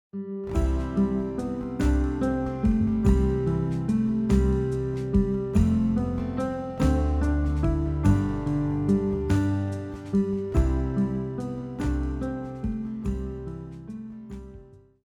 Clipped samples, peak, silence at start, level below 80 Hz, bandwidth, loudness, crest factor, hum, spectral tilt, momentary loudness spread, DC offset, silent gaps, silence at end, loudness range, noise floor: under 0.1%; -10 dBFS; 0.15 s; -30 dBFS; 11.5 kHz; -26 LUFS; 16 dB; none; -9 dB/octave; 11 LU; under 0.1%; none; 0.25 s; 6 LU; -48 dBFS